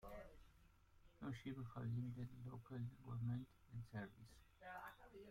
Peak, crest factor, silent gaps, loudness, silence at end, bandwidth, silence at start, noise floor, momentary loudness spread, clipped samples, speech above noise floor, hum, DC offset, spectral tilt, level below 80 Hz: -38 dBFS; 14 dB; none; -52 LUFS; 0 s; 15.5 kHz; 0 s; -71 dBFS; 14 LU; under 0.1%; 20 dB; none; under 0.1%; -8 dB/octave; -70 dBFS